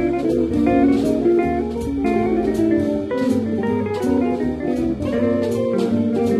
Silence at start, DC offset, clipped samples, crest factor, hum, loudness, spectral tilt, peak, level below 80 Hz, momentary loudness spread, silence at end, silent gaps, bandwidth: 0 s; under 0.1%; under 0.1%; 12 dB; none; -19 LUFS; -7.5 dB/octave; -6 dBFS; -38 dBFS; 5 LU; 0 s; none; 13 kHz